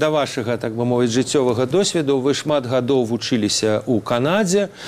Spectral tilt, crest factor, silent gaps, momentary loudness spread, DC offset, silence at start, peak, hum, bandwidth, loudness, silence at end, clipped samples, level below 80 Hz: -4.5 dB/octave; 16 dB; none; 3 LU; under 0.1%; 0 s; -4 dBFS; none; 15.5 kHz; -19 LUFS; 0 s; under 0.1%; -56 dBFS